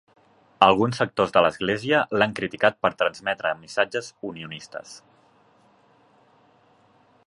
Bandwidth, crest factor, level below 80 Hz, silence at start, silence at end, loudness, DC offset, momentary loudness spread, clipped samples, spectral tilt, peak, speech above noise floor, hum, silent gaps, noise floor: 11.5 kHz; 24 dB; -60 dBFS; 0.6 s; 2.3 s; -22 LUFS; under 0.1%; 17 LU; under 0.1%; -5 dB/octave; 0 dBFS; 36 dB; none; none; -59 dBFS